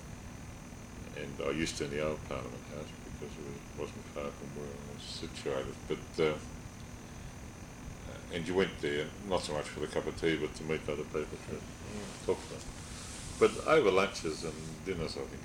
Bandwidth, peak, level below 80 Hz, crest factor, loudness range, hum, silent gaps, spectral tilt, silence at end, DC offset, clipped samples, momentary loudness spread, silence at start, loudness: 17 kHz; -12 dBFS; -52 dBFS; 24 dB; 8 LU; none; none; -4.5 dB/octave; 0 s; under 0.1%; under 0.1%; 17 LU; 0 s; -36 LUFS